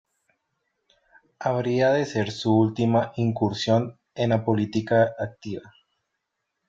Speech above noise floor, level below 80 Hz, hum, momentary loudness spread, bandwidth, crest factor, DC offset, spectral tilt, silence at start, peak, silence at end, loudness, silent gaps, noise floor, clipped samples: 57 dB; -62 dBFS; none; 11 LU; 7.6 kHz; 18 dB; under 0.1%; -7 dB/octave; 1.4 s; -8 dBFS; 1 s; -24 LUFS; none; -80 dBFS; under 0.1%